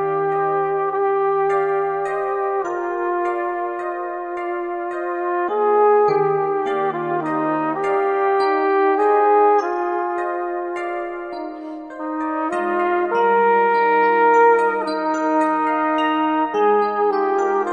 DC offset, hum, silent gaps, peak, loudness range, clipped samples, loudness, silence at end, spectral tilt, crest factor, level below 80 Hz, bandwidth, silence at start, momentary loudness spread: under 0.1%; none; none; -4 dBFS; 7 LU; under 0.1%; -19 LUFS; 0 s; -6 dB/octave; 14 dB; -62 dBFS; 9 kHz; 0 s; 10 LU